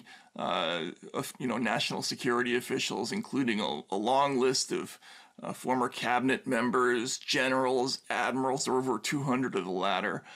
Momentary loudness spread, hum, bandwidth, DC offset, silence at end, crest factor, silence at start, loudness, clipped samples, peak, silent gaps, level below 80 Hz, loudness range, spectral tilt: 10 LU; none; 15.5 kHz; under 0.1%; 0 s; 18 dB; 0.05 s; -30 LUFS; under 0.1%; -12 dBFS; none; -76 dBFS; 2 LU; -3.5 dB/octave